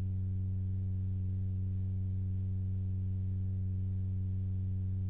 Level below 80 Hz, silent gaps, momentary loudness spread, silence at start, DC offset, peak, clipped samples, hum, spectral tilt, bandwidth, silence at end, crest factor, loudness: -42 dBFS; none; 0 LU; 0 s; 0.3%; -28 dBFS; under 0.1%; none; -13.5 dB/octave; 1 kHz; 0 s; 6 dB; -36 LUFS